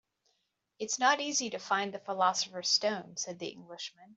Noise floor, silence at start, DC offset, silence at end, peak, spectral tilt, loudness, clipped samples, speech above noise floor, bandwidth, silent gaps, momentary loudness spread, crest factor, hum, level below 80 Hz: -79 dBFS; 0.8 s; under 0.1%; 0.05 s; -12 dBFS; -1 dB/octave; -31 LUFS; under 0.1%; 46 dB; 8.2 kHz; none; 15 LU; 22 dB; none; -84 dBFS